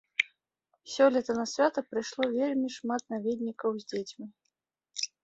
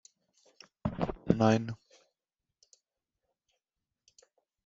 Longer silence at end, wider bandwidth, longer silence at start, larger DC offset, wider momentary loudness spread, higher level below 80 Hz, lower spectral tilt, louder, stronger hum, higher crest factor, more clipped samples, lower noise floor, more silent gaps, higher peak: second, 0.15 s vs 2.9 s; about the same, 8 kHz vs 7.6 kHz; second, 0.2 s vs 0.85 s; neither; about the same, 15 LU vs 16 LU; second, -76 dBFS vs -58 dBFS; second, -3.5 dB/octave vs -7 dB/octave; about the same, -30 LUFS vs -31 LUFS; neither; about the same, 24 dB vs 28 dB; neither; second, -82 dBFS vs -90 dBFS; neither; about the same, -8 dBFS vs -8 dBFS